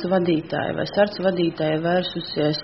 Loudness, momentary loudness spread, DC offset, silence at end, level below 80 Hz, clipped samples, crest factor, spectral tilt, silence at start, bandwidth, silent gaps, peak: -22 LUFS; 4 LU; 0.1%; 0 s; -56 dBFS; under 0.1%; 16 dB; -4.5 dB/octave; 0 s; 6 kHz; none; -4 dBFS